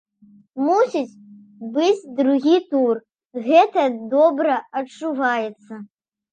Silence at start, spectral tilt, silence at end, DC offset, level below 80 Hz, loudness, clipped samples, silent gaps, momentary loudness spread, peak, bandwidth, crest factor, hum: 0.55 s; -5 dB/octave; 0.45 s; under 0.1%; -80 dBFS; -19 LUFS; under 0.1%; 3.25-3.29 s; 18 LU; -2 dBFS; 9 kHz; 18 dB; none